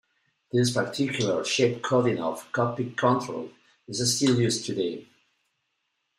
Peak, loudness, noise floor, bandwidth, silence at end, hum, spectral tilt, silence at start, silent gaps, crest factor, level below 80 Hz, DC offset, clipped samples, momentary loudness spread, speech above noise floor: -10 dBFS; -26 LUFS; -77 dBFS; 15 kHz; 1.15 s; none; -4.5 dB/octave; 0.55 s; none; 18 dB; -68 dBFS; under 0.1%; under 0.1%; 10 LU; 52 dB